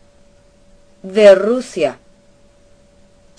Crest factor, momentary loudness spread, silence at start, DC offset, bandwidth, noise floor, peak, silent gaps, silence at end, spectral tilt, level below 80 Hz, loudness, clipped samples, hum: 18 dB; 13 LU; 1.05 s; under 0.1%; 10.5 kHz; -49 dBFS; 0 dBFS; none; 1.45 s; -5 dB/octave; -54 dBFS; -13 LUFS; 0.2%; none